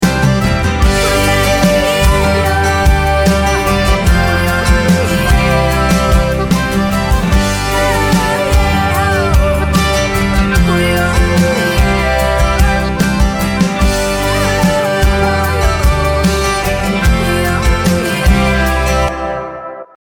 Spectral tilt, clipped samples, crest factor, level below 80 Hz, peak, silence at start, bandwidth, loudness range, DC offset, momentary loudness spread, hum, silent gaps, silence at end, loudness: -5 dB/octave; under 0.1%; 12 dB; -16 dBFS; 0 dBFS; 0 s; 19.5 kHz; 1 LU; under 0.1%; 3 LU; none; none; 0.3 s; -12 LUFS